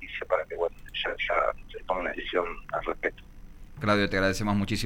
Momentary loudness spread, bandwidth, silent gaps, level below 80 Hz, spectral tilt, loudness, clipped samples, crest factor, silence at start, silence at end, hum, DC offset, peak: 7 LU; 17 kHz; none; -44 dBFS; -5 dB/octave; -29 LUFS; under 0.1%; 18 dB; 0 s; 0 s; none; under 0.1%; -10 dBFS